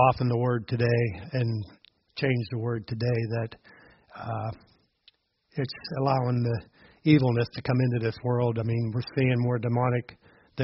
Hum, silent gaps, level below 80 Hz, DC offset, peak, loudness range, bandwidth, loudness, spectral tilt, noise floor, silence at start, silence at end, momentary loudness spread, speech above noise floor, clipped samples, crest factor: none; none; -58 dBFS; under 0.1%; -6 dBFS; 7 LU; 5.8 kHz; -27 LUFS; -7 dB/octave; -64 dBFS; 0 s; 0 s; 12 LU; 38 dB; under 0.1%; 20 dB